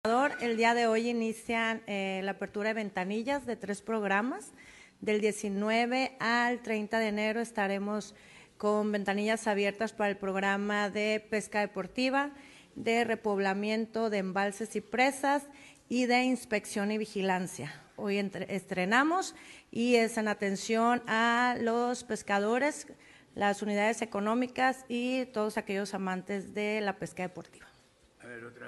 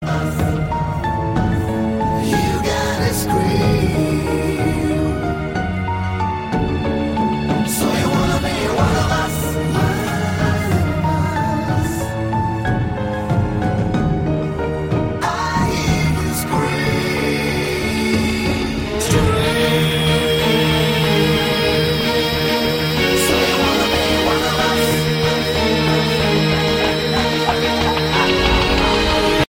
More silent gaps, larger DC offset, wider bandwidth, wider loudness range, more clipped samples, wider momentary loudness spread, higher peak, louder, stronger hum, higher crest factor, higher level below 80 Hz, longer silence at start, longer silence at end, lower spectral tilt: neither; neither; second, 12 kHz vs 16.5 kHz; about the same, 4 LU vs 4 LU; neither; first, 10 LU vs 5 LU; second, -12 dBFS vs -2 dBFS; second, -31 LUFS vs -17 LUFS; neither; first, 20 dB vs 14 dB; second, -70 dBFS vs -30 dBFS; about the same, 0.05 s vs 0 s; about the same, 0 s vs 0.05 s; about the same, -4.5 dB/octave vs -5 dB/octave